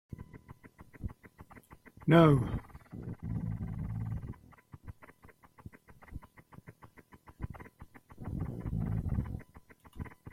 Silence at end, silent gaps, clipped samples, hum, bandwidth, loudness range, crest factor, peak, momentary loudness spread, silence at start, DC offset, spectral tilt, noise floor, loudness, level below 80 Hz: 0 s; none; under 0.1%; none; 13.5 kHz; 21 LU; 26 dB; -10 dBFS; 28 LU; 0.2 s; under 0.1%; -8.5 dB/octave; -59 dBFS; -32 LUFS; -50 dBFS